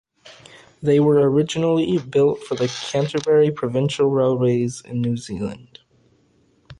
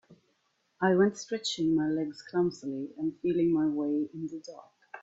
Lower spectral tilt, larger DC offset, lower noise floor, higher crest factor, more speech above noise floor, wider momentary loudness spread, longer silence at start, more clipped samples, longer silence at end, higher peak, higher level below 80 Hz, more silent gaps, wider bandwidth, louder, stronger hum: about the same, -6.5 dB/octave vs -5.5 dB/octave; neither; second, -60 dBFS vs -74 dBFS; about the same, 14 dB vs 18 dB; second, 41 dB vs 45 dB; second, 10 LU vs 13 LU; first, 0.25 s vs 0.1 s; neither; about the same, 0.05 s vs 0.05 s; first, -6 dBFS vs -12 dBFS; first, -56 dBFS vs -70 dBFS; neither; first, 11 kHz vs 8 kHz; first, -20 LUFS vs -30 LUFS; neither